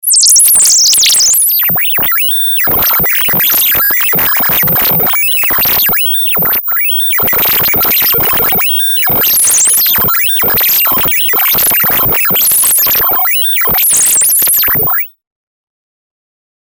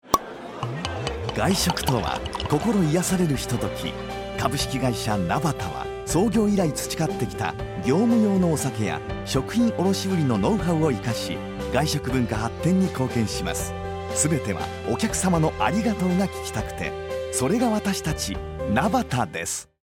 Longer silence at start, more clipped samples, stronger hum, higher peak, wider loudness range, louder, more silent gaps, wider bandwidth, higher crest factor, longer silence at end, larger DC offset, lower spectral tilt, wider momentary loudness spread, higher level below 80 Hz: about the same, 0.05 s vs 0.05 s; neither; neither; first, 0 dBFS vs -4 dBFS; about the same, 1 LU vs 2 LU; first, -6 LUFS vs -24 LUFS; neither; first, over 20 kHz vs 16.5 kHz; second, 10 dB vs 20 dB; first, 1.55 s vs 0.2 s; neither; second, 0 dB/octave vs -5 dB/octave; second, 4 LU vs 8 LU; about the same, -40 dBFS vs -42 dBFS